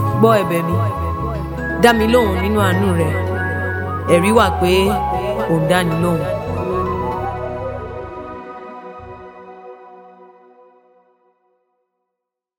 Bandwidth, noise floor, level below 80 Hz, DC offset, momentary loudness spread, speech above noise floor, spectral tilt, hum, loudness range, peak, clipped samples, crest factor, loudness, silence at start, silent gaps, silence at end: 17 kHz; -80 dBFS; -34 dBFS; under 0.1%; 20 LU; 66 dB; -6 dB/octave; none; 18 LU; 0 dBFS; under 0.1%; 18 dB; -17 LUFS; 0 s; none; 2.35 s